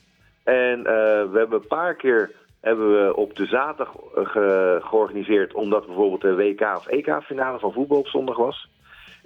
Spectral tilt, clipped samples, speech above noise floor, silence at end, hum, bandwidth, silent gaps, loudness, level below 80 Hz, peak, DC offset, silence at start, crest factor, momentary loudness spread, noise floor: -7 dB/octave; under 0.1%; 27 dB; 0.6 s; none; 4.6 kHz; none; -22 LUFS; -64 dBFS; -6 dBFS; under 0.1%; 0.45 s; 16 dB; 7 LU; -48 dBFS